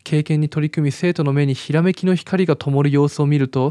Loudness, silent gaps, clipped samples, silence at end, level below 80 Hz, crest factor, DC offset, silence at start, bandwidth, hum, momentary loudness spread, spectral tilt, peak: -18 LUFS; none; under 0.1%; 0 s; -66 dBFS; 14 dB; under 0.1%; 0.05 s; 10.5 kHz; none; 3 LU; -7.5 dB/octave; -2 dBFS